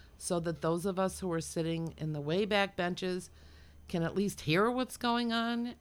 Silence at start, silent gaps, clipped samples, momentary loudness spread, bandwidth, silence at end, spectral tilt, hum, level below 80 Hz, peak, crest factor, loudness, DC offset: 0.05 s; none; under 0.1%; 8 LU; 17.5 kHz; 0.05 s; -5 dB/octave; none; -58 dBFS; -14 dBFS; 18 dB; -33 LUFS; under 0.1%